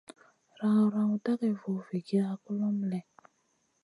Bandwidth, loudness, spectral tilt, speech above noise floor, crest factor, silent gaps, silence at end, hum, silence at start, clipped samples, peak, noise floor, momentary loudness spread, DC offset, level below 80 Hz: 11.5 kHz; -31 LUFS; -8.5 dB/octave; 45 dB; 14 dB; none; 0.8 s; none; 0.6 s; under 0.1%; -16 dBFS; -74 dBFS; 9 LU; under 0.1%; -82 dBFS